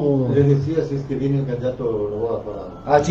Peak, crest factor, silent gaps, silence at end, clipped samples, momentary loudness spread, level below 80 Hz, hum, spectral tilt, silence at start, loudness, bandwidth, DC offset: -2 dBFS; 18 dB; none; 0 s; under 0.1%; 9 LU; -44 dBFS; none; -8 dB/octave; 0 s; -21 LUFS; 7 kHz; under 0.1%